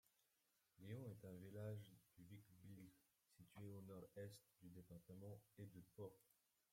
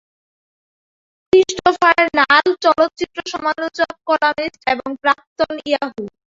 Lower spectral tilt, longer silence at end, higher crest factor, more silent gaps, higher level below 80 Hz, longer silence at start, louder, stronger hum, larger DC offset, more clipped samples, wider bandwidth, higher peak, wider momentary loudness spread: first, -7 dB/octave vs -3 dB/octave; first, 0.4 s vs 0.2 s; about the same, 18 dB vs 16 dB; second, none vs 5.27-5.36 s; second, -86 dBFS vs -54 dBFS; second, 0.75 s vs 1.35 s; second, -61 LUFS vs -16 LUFS; neither; neither; neither; first, 16.5 kHz vs 7.8 kHz; second, -42 dBFS vs -2 dBFS; about the same, 10 LU vs 9 LU